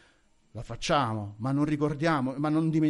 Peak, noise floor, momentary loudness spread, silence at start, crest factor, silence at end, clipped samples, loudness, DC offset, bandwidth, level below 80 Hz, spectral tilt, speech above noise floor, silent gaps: -14 dBFS; -64 dBFS; 14 LU; 0.55 s; 14 dB; 0 s; under 0.1%; -28 LUFS; under 0.1%; 11.5 kHz; -52 dBFS; -6.5 dB/octave; 36 dB; none